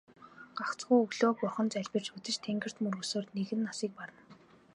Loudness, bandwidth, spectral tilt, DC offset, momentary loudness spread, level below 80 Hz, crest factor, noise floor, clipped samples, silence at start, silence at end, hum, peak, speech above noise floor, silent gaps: -33 LUFS; 11 kHz; -4.5 dB/octave; under 0.1%; 12 LU; -80 dBFS; 20 dB; -59 dBFS; under 0.1%; 0.2 s; 0.4 s; none; -14 dBFS; 26 dB; none